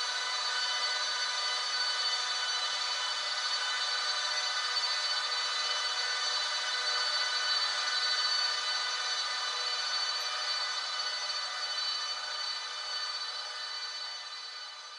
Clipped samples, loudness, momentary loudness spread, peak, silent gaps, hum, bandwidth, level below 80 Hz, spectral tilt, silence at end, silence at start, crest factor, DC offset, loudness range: under 0.1%; -30 LUFS; 7 LU; -18 dBFS; none; none; 12 kHz; -86 dBFS; 4.5 dB/octave; 0 s; 0 s; 14 dB; under 0.1%; 4 LU